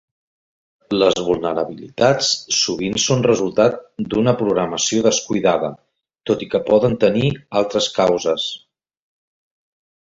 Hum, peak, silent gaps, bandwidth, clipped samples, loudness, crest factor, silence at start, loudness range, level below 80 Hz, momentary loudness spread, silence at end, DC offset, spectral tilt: none; -2 dBFS; none; 8 kHz; under 0.1%; -18 LUFS; 18 dB; 0.9 s; 2 LU; -52 dBFS; 8 LU; 1.5 s; under 0.1%; -4 dB/octave